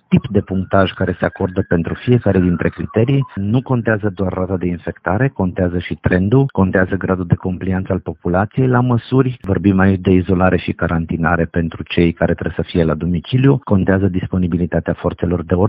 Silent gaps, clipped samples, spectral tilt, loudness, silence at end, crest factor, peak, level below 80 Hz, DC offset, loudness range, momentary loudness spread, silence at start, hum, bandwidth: none; under 0.1%; -7 dB/octave; -17 LUFS; 0 s; 16 dB; 0 dBFS; -36 dBFS; under 0.1%; 2 LU; 6 LU; 0.1 s; none; 4.9 kHz